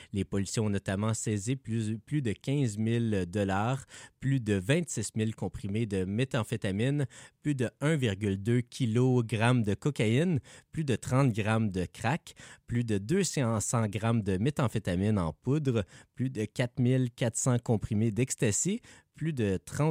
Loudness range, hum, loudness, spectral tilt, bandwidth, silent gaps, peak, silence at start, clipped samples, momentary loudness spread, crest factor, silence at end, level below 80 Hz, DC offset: 3 LU; none; -30 LUFS; -6 dB/octave; 15.5 kHz; none; -12 dBFS; 0 s; under 0.1%; 7 LU; 18 dB; 0 s; -58 dBFS; under 0.1%